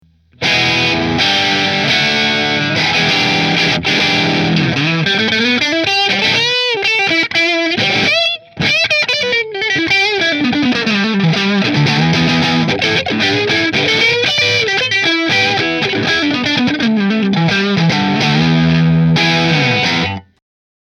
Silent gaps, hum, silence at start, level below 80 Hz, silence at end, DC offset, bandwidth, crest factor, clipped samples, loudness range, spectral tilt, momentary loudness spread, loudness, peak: none; none; 0.4 s; -46 dBFS; 0.65 s; under 0.1%; 13.5 kHz; 14 dB; under 0.1%; 1 LU; -4.5 dB/octave; 3 LU; -12 LUFS; 0 dBFS